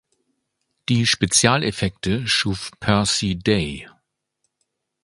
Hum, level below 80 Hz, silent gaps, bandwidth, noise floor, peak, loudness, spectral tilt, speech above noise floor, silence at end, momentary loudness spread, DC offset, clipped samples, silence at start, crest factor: none; -44 dBFS; none; 11.5 kHz; -75 dBFS; 0 dBFS; -20 LUFS; -3.5 dB/octave; 54 dB; 1.15 s; 10 LU; under 0.1%; under 0.1%; 0.9 s; 22 dB